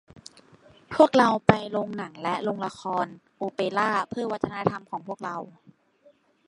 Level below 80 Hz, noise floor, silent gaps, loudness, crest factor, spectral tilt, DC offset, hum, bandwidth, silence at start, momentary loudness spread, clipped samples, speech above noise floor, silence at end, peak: -58 dBFS; -60 dBFS; none; -26 LUFS; 26 dB; -6 dB/octave; under 0.1%; none; 11 kHz; 0.9 s; 15 LU; under 0.1%; 35 dB; 0.95 s; 0 dBFS